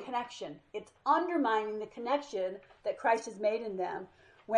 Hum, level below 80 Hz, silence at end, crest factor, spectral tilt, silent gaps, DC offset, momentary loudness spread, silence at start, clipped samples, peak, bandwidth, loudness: none; -76 dBFS; 0 s; 18 dB; -4.5 dB/octave; none; under 0.1%; 14 LU; 0 s; under 0.1%; -14 dBFS; 10.5 kHz; -33 LUFS